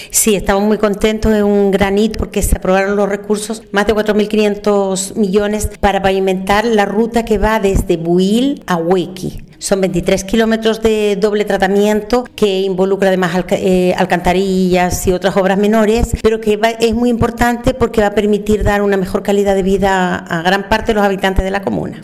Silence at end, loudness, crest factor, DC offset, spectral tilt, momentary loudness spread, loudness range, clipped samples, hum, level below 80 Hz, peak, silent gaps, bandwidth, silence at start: 0 s; -14 LUFS; 12 dB; under 0.1%; -5 dB/octave; 4 LU; 2 LU; under 0.1%; none; -28 dBFS; -2 dBFS; none; 15.5 kHz; 0 s